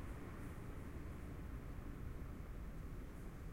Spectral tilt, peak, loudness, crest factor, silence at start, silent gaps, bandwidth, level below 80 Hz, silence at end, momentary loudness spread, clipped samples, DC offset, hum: -7 dB/octave; -36 dBFS; -52 LUFS; 12 dB; 0 s; none; 16.5 kHz; -52 dBFS; 0 s; 1 LU; under 0.1%; under 0.1%; none